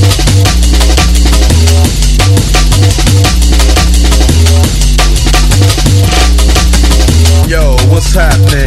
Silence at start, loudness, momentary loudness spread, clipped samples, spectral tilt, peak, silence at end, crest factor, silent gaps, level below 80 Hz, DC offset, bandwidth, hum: 0 s; -7 LUFS; 2 LU; 2%; -4.5 dB/octave; 0 dBFS; 0 s; 6 dB; none; -8 dBFS; 0.6%; 13 kHz; none